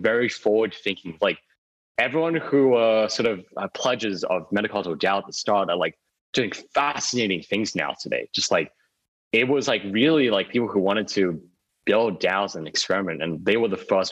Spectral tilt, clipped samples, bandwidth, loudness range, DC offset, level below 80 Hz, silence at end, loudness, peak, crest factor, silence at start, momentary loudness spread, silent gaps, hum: -4 dB/octave; under 0.1%; 9.8 kHz; 2 LU; under 0.1%; -66 dBFS; 0 s; -23 LUFS; -8 dBFS; 16 dB; 0 s; 7 LU; 1.58-1.95 s, 6.21-6.33 s, 9.08-9.31 s; none